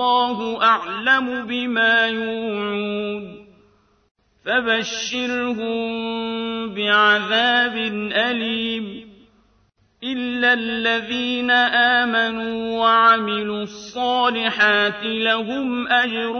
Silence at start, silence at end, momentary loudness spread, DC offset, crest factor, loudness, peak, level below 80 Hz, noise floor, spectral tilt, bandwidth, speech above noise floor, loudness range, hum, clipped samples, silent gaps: 0 s; 0 s; 11 LU; under 0.1%; 18 dB; -19 LUFS; -4 dBFS; -62 dBFS; -61 dBFS; -3.5 dB/octave; 6.6 kHz; 41 dB; 6 LU; none; under 0.1%; 4.11-4.15 s